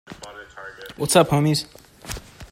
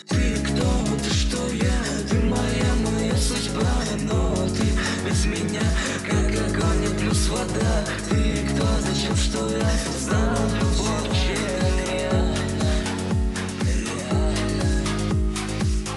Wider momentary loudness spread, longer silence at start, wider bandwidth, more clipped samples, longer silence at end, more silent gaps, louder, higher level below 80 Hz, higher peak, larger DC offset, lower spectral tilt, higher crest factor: first, 22 LU vs 3 LU; about the same, 0.1 s vs 0.05 s; first, 16 kHz vs 12.5 kHz; neither; about the same, 0.05 s vs 0 s; neither; first, -19 LUFS vs -23 LUFS; second, -48 dBFS vs -28 dBFS; first, -2 dBFS vs -10 dBFS; neither; about the same, -4.5 dB/octave vs -5 dB/octave; first, 22 dB vs 12 dB